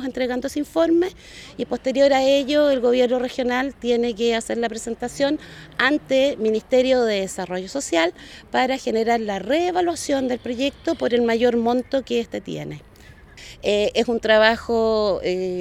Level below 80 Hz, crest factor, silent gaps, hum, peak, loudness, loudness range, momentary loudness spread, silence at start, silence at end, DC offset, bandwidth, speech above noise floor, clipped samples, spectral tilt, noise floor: -50 dBFS; 20 dB; none; none; 0 dBFS; -21 LUFS; 3 LU; 11 LU; 0 s; 0 s; under 0.1%; 14.5 kHz; 25 dB; under 0.1%; -4 dB/octave; -46 dBFS